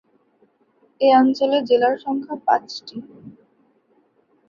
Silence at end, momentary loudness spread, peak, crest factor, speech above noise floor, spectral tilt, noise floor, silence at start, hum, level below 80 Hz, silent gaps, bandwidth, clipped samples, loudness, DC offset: 1.2 s; 18 LU; -4 dBFS; 18 dB; 43 dB; -5 dB/octave; -62 dBFS; 1 s; none; -70 dBFS; none; 7.2 kHz; under 0.1%; -18 LUFS; under 0.1%